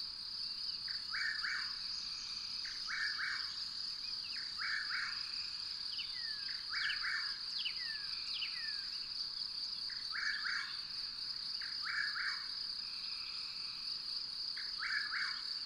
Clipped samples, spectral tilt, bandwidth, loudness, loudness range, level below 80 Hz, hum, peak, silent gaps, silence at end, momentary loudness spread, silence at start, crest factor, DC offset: under 0.1%; 1 dB/octave; 16 kHz; -38 LUFS; 1 LU; -70 dBFS; none; -24 dBFS; none; 0 s; 4 LU; 0 s; 18 dB; under 0.1%